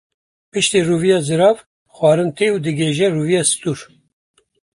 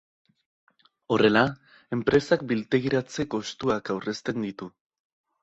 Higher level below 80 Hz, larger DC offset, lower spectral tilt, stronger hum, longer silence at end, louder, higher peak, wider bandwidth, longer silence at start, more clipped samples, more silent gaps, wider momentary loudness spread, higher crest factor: about the same, -56 dBFS vs -58 dBFS; neither; about the same, -4.5 dB/octave vs -5.5 dB/octave; neither; first, 0.95 s vs 0.75 s; first, -16 LUFS vs -26 LUFS; first, -2 dBFS vs -6 dBFS; first, 11.5 kHz vs 8 kHz; second, 0.55 s vs 1.1 s; neither; first, 1.66-1.86 s vs none; second, 9 LU vs 13 LU; second, 16 dB vs 22 dB